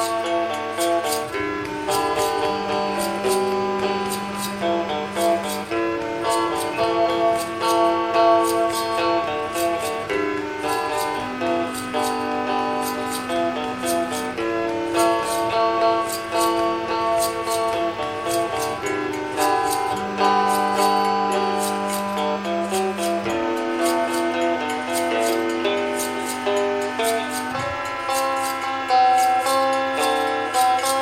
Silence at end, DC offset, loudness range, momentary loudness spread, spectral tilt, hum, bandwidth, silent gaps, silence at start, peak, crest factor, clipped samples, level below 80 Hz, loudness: 0 s; under 0.1%; 3 LU; 6 LU; -3.5 dB/octave; none; 17 kHz; none; 0 s; -6 dBFS; 16 dB; under 0.1%; -56 dBFS; -22 LUFS